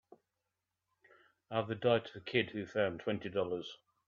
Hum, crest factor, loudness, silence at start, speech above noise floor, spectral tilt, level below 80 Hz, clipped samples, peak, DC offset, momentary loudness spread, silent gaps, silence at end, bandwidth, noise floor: none; 24 dB; -36 LUFS; 1.5 s; 53 dB; -7 dB/octave; -76 dBFS; under 0.1%; -14 dBFS; under 0.1%; 7 LU; none; 0.35 s; 7.2 kHz; -88 dBFS